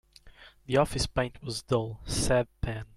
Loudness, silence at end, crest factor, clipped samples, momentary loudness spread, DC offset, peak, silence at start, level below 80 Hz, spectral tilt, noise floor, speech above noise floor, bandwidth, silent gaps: -30 LUFS; 0.1 s; 18 dB; under 0.1%; 8 LU; under 0.1%; -12 dBFS; 0.25 s; -42 dBFS; -4.5 dB/octave; -54 dBFS; 24 dB; 15.5 kHz; none